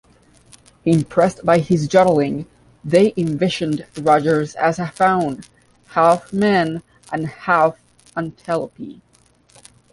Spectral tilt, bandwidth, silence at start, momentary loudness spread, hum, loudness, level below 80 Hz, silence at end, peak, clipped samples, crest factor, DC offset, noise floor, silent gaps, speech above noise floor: -6.5 dB/octave; 11.5 kHz; 0.85 s; 14 LU; none; -18 LUFS; -54 dBFS; 1 s; -2 dBFS; under 0.1%; 18 dB; under 0.1%; -54 dBFS; none; 37 dB